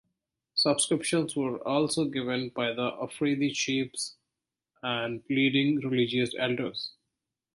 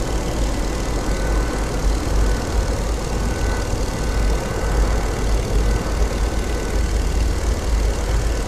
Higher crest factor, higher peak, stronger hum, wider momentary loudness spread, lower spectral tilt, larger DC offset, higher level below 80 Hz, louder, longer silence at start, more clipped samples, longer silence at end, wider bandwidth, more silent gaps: first, 18 dB vs 12 dB; second, -12 dBFS vs -6 dBFS; neither; first, 9 LU vs 2 LU; about the same, -4 dB/octave vs -5 dB/octave; neither; second, -70 dBFS vs -20 dBFS; second, -28 LUFS vs -22 LUFS; first, 0.55 s vs 0 s; neither; first, 0.65 s vs 0 s; second, 11.5 kHz vs 13.5 kHz; neither